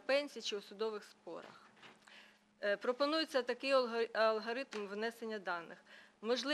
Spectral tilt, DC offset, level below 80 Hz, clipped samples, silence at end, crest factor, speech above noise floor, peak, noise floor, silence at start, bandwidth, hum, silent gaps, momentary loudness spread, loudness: -3 dB/octave; under 0.1%; under -90 dBFS; under 0.1%; 0 s; 20 dB; 24 dB; -20 dBFS; -63 dBFS; 0.1 s; 13.5 kHz; none; none; 21 LU; -38 LUFS